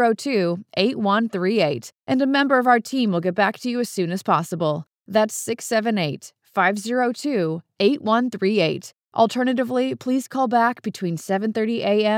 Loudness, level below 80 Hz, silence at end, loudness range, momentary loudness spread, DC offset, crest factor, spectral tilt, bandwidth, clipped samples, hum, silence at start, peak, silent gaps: -21 LUFS; -86 dBFS; 0 s; 2 LU; 7 LU; under 0.1%; 18 dB; -5 dB/octave; 17 kHz; under 0.1%; none; 0 s; -4 dBFS; 9.04-9.08 s